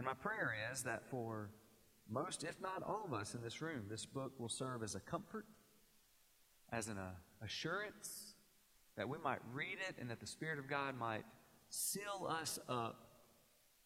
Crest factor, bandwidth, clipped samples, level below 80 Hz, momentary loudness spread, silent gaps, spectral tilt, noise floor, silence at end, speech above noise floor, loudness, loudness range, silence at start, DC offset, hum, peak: 22 dB; 16.5 kHz; under 0.1%; -78 dBFS; 9 LU; none; -3.5 dB/octave; -73 dBFS; 0.55 s; 27 dB; -45 LUFS; 5 LU; 0 s; under 0.1%; none; -26 dBFS